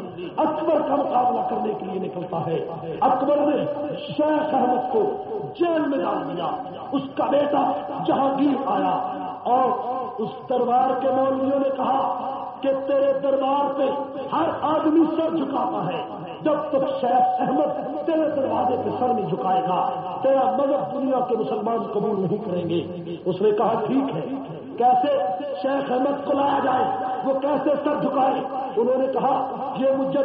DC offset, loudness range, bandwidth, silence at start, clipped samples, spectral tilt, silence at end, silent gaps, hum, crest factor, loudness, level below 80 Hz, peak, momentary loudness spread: under 0.1%; 2 LU; 5 kHz; 0 s; under 0.1%; -5.5 dB/octave; 0 s; none; none; 14 dB; -23 LUFS; -66 dBFS; -8 dBFS; 8 LU